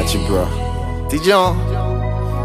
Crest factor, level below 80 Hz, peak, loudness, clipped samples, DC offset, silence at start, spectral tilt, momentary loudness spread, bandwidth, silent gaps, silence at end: 16 dB; -24 dBFS; 0 dBFS; -18 LUFS; under 0.1%; under 0.1%; 0 s; -5.5 dB/octave; 9 LU; 15.5 kHz; none; 0 s